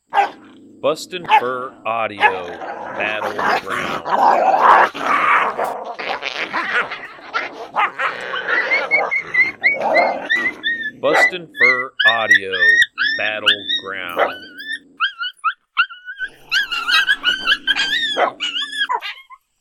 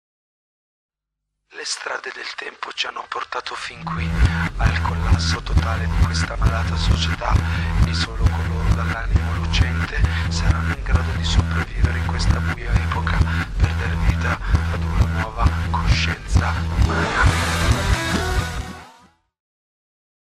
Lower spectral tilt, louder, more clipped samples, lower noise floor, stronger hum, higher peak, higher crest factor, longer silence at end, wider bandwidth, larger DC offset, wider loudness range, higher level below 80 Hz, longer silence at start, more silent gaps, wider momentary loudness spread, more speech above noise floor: second, -2 dB/octave vs -5 dB/octave; first, -17 LUFS vs -21 LUFS; neither; second, -43 dBFS vs -80 dBFS; neither; first, 0 dBFS vs -6 dBFS; about the same, 18 dB vs 14 dB; second, 0.25 s vs 1.45 s; first, 18 kHz vs 13 kHz; neither; about the same, 6 LU vs 4 LU; second, -58 dBFS vs -24 dBFS; second, 0.1 s vs 1.55 s; neither; first, 12 LU vs 8 LU; second, 26 dB vs 61 dB